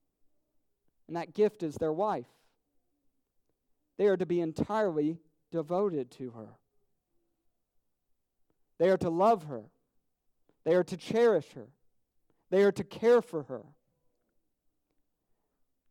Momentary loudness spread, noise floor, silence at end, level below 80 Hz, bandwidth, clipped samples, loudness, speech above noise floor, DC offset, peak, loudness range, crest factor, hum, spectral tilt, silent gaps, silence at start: 17 LU; -78 dBFS; 2.3 s; -70 dBFS; 13 kHz; under 0.1%; -30 LUFS; 48 dB; under 0.1%; -14 dBFS; 6 LU; 18 dB; none; -7 dB/octave; none; 1.1 s